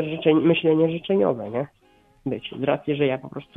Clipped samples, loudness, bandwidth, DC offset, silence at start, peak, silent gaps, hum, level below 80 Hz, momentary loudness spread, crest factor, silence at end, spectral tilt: under 0.1%; -23 LUFS; 3.9 kHz; under 0.1%; 0 s; -4 dBFS; none; none; -60 dBFS; 12 LU; 18 dB; 0.15 s; -9.5 dB/octave